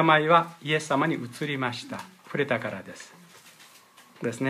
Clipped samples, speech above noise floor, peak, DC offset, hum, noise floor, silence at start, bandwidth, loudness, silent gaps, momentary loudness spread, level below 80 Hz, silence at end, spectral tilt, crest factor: under 0.1%; 28 dB; -6 dBFS; under 0.1%; none; -54 dBFS; 0 s; 15.5 kHz; -26 LUFS; none; 19 LU; -76 dBFS; 0 s; -5 dB/octave; 22 dB